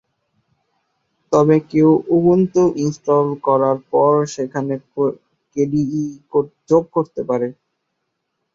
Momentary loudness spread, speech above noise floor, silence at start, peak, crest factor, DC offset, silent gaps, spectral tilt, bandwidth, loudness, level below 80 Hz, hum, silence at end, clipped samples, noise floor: 9 LU; 57 dB; 1.3 s; -2 dBFS; 16 dB; under 0.1%; none; -8 dB/octave; 7.6 kHz; -17 LUFS; -56 dBFS; none; 1.05 s; under 0.1%; -74 dBFS